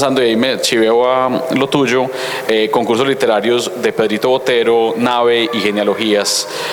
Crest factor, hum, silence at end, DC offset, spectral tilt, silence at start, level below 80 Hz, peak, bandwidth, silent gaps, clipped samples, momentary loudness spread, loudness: 12 dB; none; 0 s; under 0.1%; -3.5 dB/octave; 0 s; -58 dBFS; -2 dBFS; 19.5 kHz; none; under 0.1%; 4 LU; -14 LUFS